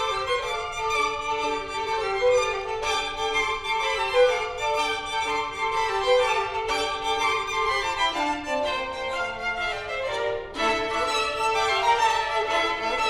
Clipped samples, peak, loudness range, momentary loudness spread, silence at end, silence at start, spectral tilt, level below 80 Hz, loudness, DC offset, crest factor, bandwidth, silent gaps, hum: under 0.1%; -8 dBFS; 2 LU; 6 LU; 0 s; 0 s; -2 dB/octave; -48 dBFS; -25 LUFS; under 0.1%; 16 dB; 15 kHz; none; none